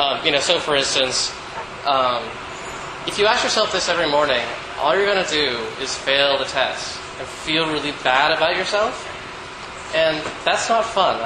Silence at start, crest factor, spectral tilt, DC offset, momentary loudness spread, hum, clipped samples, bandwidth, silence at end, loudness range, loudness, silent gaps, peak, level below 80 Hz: 0 s; 20 dB; -2 dB/octave; under 0.1%; 13 LU; none; under 0.1%; 11.5 kHz; 0 s; 2 LU; -19 LUFS; none; 0 dBFS; -50 dBFS